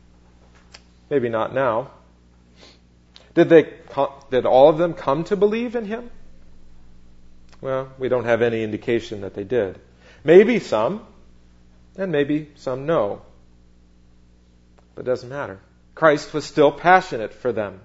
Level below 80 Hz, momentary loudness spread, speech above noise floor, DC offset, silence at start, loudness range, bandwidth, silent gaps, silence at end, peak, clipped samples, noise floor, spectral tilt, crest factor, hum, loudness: -50 dBFS; 16 LU; 33 dB; under 0.1%; 1.1 s; 8 LU; 8 kHz; none; 0.05 s; 0 dBFS; under 0.1%; -52 dBFS; -6.5 dB/octave; 22 dB; 60 Hz at -50 dBFS; -20 LUFS